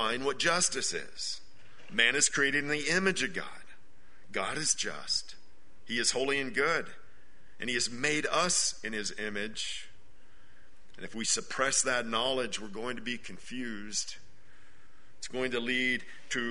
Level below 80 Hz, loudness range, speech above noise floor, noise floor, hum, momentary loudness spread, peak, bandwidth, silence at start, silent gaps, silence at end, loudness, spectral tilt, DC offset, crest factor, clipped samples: -62 dBFS; 6 LU; 30 dB; -62 dBFS; none; 13 LU; -10 dBFS; 11 kHz; 0 s; none; 0 s; -30 LUFS; -1.5 dB/octave; 1%; 22 dB; under 0.1%